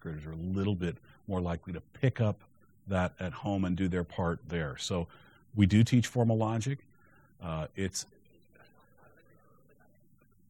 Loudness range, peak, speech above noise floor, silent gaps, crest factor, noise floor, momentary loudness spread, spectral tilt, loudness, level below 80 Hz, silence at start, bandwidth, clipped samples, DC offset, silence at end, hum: 11 LU; -12 dBFS; 35 dB; none; 22 dB; -66 dBFS; 15 LU; -6.5 dB/octave; -32 LUFS; -54 dBFS; 0.05 s; 13 kHz; under 0.1%; under 0.1%; 2.45 s; none